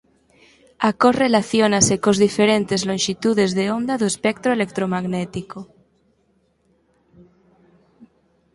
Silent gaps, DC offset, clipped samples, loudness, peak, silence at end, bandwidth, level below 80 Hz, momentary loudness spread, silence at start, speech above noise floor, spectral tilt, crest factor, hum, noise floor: none; under 0.1%; under 0.1%; -19 LUFS; -2 dBFS; 0.5 s; 11.5 kHz; -54 dBFS; 9 LU; 0.8 s; 45 dB; -4 dB/octave; 20 dB; none; -63 dBFS